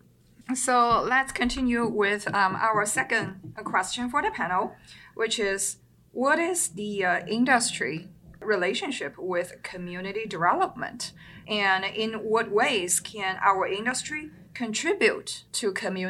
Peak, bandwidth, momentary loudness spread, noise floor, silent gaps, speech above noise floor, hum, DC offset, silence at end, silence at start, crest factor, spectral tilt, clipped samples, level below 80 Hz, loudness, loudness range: -6 dBFS; 16 kHz; 13 LU; -48 dBFS; none; 22 dB; none; under 0.1%; 0 s; 0.5 s; 20 dB; -2.5 dB/octave; under 0.1%; -56 dBFS; -26 LUFS; 4 LU